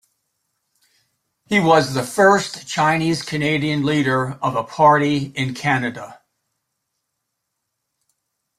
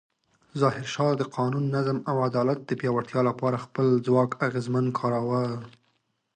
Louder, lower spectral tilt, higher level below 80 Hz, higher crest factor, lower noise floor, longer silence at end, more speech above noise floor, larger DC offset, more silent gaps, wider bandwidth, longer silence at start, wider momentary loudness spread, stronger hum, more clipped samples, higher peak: first, -18 LUFS vs -26 LUFS; second, -5 dB/octave vs -7.5 dB/octave; first, -58 dBFS vs -68 dBFS; about the same, 18 dB vs 18 dB; first, -77 dBFS vs -73 dBFS; first, 2.45 s vs 0.65 s; first, 59 dB vs 47 dB; neither; neither; first, 15 kHz vs 9.4 kHz; first, 1.5 s vs 0.55 s; first, 9 LU vs 5 LU; neither; neither; first, -2 dBFS vs -8 dBFS